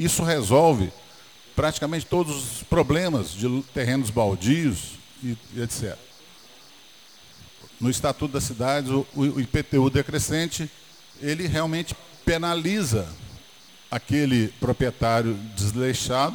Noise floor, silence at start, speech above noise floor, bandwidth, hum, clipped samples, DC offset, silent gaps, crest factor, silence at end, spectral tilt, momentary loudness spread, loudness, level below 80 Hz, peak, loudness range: -50 dBFS; 0 s; 27 dB; over 20 kHz; none; under 0.1%; 0.1%; none; 20 dB; 0 s; -5 dB/octave; 11 LU; -24 LUFS; -44 dBFS; -4 dBFS; 6 LU